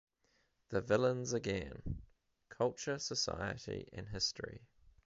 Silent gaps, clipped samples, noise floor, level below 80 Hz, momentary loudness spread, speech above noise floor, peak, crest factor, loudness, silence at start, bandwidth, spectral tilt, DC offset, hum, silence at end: none; under 0.1%; -77 dBFS; -58 dBFS; 14 LU; 39 dB; -20 dBFS; 20 dB; -38 LUFS; 0.7 s; 7.6 kHz; -4 dB/octave; under 0.1%; none; 0.15 s